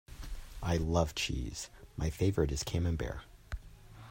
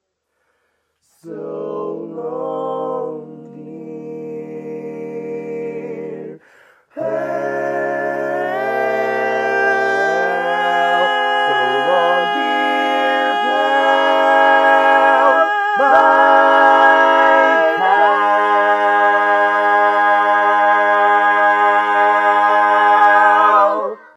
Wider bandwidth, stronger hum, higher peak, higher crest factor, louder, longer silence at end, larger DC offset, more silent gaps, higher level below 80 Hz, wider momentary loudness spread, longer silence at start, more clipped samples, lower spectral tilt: first, 16 kHz vs 11.5 kHz; neither; second, -16 dBFS vs 0 dBFS; first, 20 dB vs 14 dB; second, -35 LUFS vs -13 LUFS; second, 0 s vs 0.2 s; neither; neither; first, -44 dBFS vs -76 dBFS; about the same, 16 LU vs 17 LU; second, 0.1 s vs 1.25 s; neither; first, -5.5 dB/octave vs -4 dB/octave